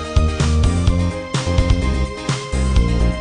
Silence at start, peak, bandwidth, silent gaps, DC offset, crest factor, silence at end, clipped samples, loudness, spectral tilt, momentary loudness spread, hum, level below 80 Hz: 0 s; -2 dBFS; 10 kHz; none; under 0.1%; 14 dB; 0 s; under 0.1%; -19 LUFS; -6 dB/octave; 5 LU; none; -20 dBFS